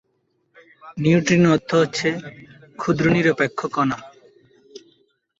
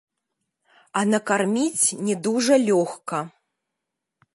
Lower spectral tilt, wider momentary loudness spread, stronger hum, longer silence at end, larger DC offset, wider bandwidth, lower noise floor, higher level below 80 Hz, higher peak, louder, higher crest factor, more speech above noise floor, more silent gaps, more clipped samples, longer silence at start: first, -6 dB/octave vs -4 dB/octave; first, 15 LU vs 11 LU; neither; second, 0.6 s vs 1.05 s; neither; second, 8 kHz vs 11.5 kHz; second, -69 dBFS vs -83 dBFS; first, -56 dBFS vs -76 dBFS; about the same, -4 dBFS vs -6 dBFS; first, -19 LUFS vs -22 LUFS; about the same, 18 dB vs 18 dB; second, 49 dB vs 61 dB; neither; neither; about the same, 0.85 s vs 0.95 s